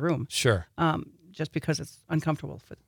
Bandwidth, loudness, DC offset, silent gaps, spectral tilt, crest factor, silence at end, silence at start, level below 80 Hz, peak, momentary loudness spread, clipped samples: 19 kHz; -29 LUFS; under 0.1%; none; -5 dB/octave; 20 dB; 0.15 s; 0 s; -56 dBFS; -8 dBFS; 10 LU; under 0.1%